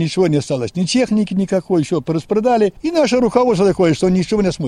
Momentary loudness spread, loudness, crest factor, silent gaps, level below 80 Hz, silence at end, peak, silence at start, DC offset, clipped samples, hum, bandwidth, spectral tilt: 5 LU; -16 LUFS; 14 dB; none; -44 dBFS; 0 s; 0 dBFS; 0 s; under 0.1%; under 0.1%; none; 11 kHz; -6 dB/octave